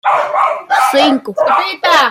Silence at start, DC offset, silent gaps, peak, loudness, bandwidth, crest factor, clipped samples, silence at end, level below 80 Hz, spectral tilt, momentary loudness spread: 0.05 s; under 0.1%; none; 0 dBFS; -12 LUFS; 16.5 kHz; 12 dB; under 0.1%; 0 s; -64 dBFS; -2.5 dB/octave; 4 LU